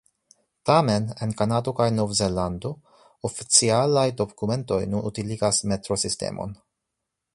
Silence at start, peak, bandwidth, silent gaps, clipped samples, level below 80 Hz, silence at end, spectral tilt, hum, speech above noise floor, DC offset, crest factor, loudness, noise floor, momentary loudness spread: 0.65 s; -2 dBFS; 11.5 kHz; none; under 0.1%; -50 dBFS; 0.8 s; -4.5 dB/octave; none; 59 dB; under 0.1%; 24 dB; -23 LUFS; -82 dBFS; 14 LU